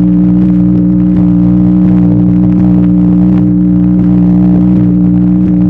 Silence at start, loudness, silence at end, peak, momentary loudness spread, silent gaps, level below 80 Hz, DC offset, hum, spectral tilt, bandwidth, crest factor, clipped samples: 0 s; -7 LUFS; 0 s; 0 dBFS; 1 LU; none; -24 dBFS; under 0.1%; 60 Hz at -10 dBFS; -12.5 dB/octave; 2.9 kHz; 6 dB; under 0.1%